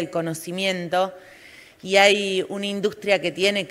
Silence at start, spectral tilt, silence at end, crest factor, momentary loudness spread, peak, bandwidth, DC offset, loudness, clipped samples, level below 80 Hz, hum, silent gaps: 0 s; -3.5 dB/octave; 0 s; 22 dB; 11 LU; 0 dBFS; 16 kHz; under 0.1%; -21 LUFS; under 0.1%; -66 dBFS; none; none